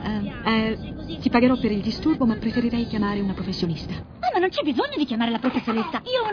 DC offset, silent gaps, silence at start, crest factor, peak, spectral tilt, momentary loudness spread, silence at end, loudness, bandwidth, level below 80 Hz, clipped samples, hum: under 0.1%; none; 0 s; 18 dB; -4 dBFS; -7 dB/octave; 8 LU; 0 s; -24 LUFS; 5.4 kHz; -44 dBFS; under 0.1%; none